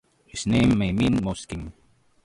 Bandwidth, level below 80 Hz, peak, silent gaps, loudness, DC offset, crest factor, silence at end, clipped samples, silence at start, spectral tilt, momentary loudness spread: 11.5 kHz; -42 dBFS; -10 dBFS; none; -23 LUFS; under 0.1%; 14 dB; 0.55 s; under 0.1%; 0.35 s; -6 dB/octave; 17 LU